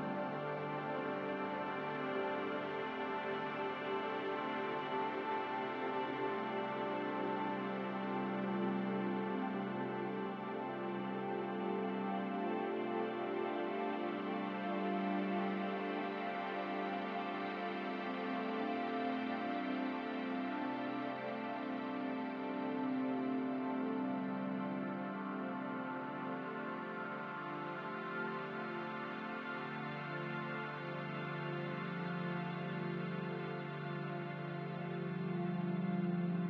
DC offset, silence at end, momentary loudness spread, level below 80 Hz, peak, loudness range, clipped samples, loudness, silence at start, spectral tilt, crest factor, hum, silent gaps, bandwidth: under 0.1%; 0 s; 5 LU; -86 dBFS; -24 dBFS; 3 LU; under 0.1%; -40 LUFS; 0 s; -8.5 dB/octave; 16 dB; none; none; 6.6 kHz